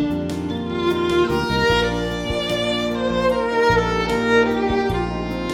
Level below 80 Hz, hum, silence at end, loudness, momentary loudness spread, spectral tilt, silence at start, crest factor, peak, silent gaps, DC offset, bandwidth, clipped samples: -36 dBFS; none; 0 s; -20 LUFS; 7 LU; -5.5 dB/octave; 0 s; 16 dB; -4 dBFS; none; under 0.1%; 16.5 kHz; under 0.1%